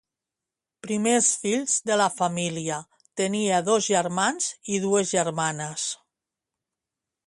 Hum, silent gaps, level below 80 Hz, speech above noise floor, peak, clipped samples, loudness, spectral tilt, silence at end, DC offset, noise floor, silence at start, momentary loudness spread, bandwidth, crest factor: none; none; -70 dBFS; 64 dB; -8 dBFS; under 0.1%; -24 LUFS; -3 dB/octave; 1.3 s; under 0.1%; -88 dBFS; 0.85 s; 10 LU; 11.5 kHz; 18 dB